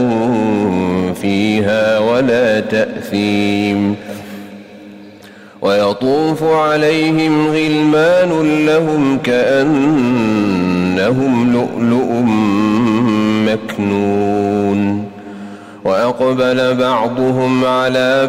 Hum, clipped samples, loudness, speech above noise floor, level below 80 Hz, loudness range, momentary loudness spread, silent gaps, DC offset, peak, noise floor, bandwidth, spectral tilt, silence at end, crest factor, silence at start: none; under 0.1%; -14 LUFS; 25 dB; -50 dBFS; 4 LU; 5 LU; none; under 0.1%; -4 dBFS; -38 dBFS; 15.5 kHz; -6.5 dB/octave; 0 s; 10 dB; 0 s